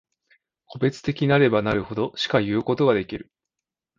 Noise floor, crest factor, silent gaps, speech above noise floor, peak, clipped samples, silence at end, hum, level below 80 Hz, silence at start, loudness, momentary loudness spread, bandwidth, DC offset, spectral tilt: -87 dBFS; 20 dB; none; 65 dB; -4 dBFS; under 0.1%; 0.75 s; none; -52 dBFS; 0.7 s; -22 LUFS; 11 LU; 7.6 kHz; under 0.1%; -7 dB/octave